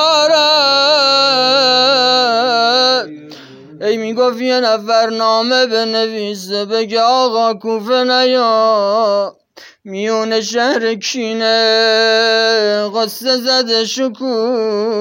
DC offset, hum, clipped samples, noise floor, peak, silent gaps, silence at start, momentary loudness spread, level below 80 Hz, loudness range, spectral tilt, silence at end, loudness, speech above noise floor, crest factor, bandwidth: under 0.1%; none; under 0.1%; -35 dBFS; -2 dBFS; none; 0 s; 9 LU; -76 dBFS; 4 LU; -2.5 dB/octave; 0 s; -13 LUFS; 21 dB; 12 dB; 16.5 kHz